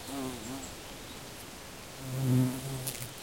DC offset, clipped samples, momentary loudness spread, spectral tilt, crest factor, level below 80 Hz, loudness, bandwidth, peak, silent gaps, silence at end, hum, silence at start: 0.1%; under 0.1%; 15 LU; -5 dB/octave; 18 dB; -58 dBFS; -36 LUFS; 17 kHz; -18 dBFS; none; 0 s; none; 0 s